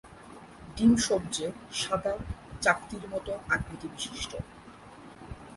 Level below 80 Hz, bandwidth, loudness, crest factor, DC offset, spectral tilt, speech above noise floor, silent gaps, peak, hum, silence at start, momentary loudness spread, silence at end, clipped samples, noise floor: -50 dBFS; 11.5 kHz; -30 LUFS; 22 dB; under 0.1%; -4 dB/octave; 20 dB; none; -8 dBFS; none; 0.05 s; 23 LU; 0 s; under 0.1%; -49 dBFS